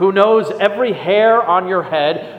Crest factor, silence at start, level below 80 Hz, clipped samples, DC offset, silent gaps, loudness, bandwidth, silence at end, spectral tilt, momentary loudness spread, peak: 14 dB; 0 s; -62 dBFS; under 0.1%; under 0.1%; none; -14 LUFS; 8.8 kHz; 0 s; -6.5 dB/octave; 6 LU; 0 dBFS